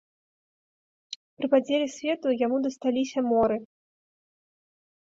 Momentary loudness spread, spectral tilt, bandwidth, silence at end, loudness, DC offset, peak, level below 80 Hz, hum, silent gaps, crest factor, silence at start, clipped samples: 13 LU; -4.5 dB/octave; 7.8 kHz; 1.45 s; -26 LUFS; under 0.1%; -10 dBFS; -66 dBFS; none; 1.16-1.37 s; 18 dB; 1.1 s; under 0.1%